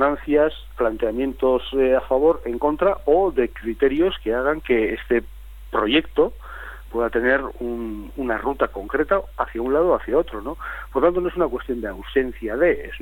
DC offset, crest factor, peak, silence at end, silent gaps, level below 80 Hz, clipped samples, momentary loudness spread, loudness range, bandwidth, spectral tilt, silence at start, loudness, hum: under 0.1%; 18 dB; -4 dBFS; 0 s; none; -38 dBFS; under 0.1%; 10 LU; 3 LU; 17 kHz; -7 dB/octave; 0 s; -22 LUFS; none